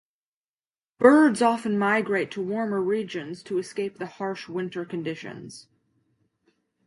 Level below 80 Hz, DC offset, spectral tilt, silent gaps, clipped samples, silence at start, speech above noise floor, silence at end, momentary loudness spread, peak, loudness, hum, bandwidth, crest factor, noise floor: -74 dBFS; under 0.1%; -6 dB/octave; none; under 0.1%; 1 s; over 66 dB; 1.25 s; 16 LU; -4 dBFS; -24 LUFS; none; 11.5 kHz; 22 dB; under -90 dBFS